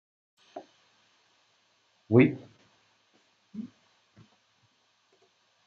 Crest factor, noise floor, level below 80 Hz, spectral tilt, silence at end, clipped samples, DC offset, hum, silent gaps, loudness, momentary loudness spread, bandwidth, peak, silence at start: 26 dB; -69 dBFS; -78 dBFS; -8 dB/octave; 2 s; under 0.1%; under 0.1%; none; none; -24 LUFS; 26 LU; 6.8 kHz; -6 dBFS; 0.55 s